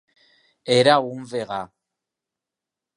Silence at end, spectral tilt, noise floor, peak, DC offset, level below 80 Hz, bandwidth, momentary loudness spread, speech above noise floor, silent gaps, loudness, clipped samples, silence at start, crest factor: 1.3 s; -4.5 dB/octave; -87 dBFS; -2 dBFS; under 0.1%; -68 dBFS; 11 kHz; 20 LU; 67 dB; none; -21 LUFS; under 0.1%; 0.65 s; 22 dB